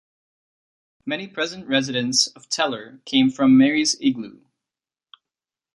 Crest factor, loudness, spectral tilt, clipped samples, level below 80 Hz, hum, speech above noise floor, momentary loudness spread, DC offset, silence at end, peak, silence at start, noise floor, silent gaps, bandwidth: 20 dB; -20 LUFS; -3 dB/octave; under 0.1%; -64 dBFS; none; 69 dB; 15 LU; under 0.1%; 1.45 s; -4 dBFS; 1.05 s; -90 dBFS; none; 11.5 kHz